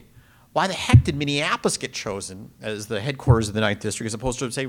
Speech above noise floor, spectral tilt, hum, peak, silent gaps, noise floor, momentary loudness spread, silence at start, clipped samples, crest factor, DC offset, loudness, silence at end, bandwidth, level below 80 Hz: 30 dB; -5 dB/octave; none; 0 dBFS; none; -52 dBFS; 15 LU; 0.55 s; under 0.1%; 22 dB; under 0.1%; -23 LUFS; 0 s; 15 kHz; -38 dBFS